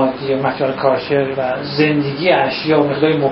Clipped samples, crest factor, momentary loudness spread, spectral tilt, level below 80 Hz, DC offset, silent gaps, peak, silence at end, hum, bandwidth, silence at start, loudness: under 0.1%; 16 dB; 4 LU; -11 dB/octave; -52 dBFS; under 0.1%; none; 0 dBFS; 0 s; none; 5.8 kHz; 0 s; -16 LUFS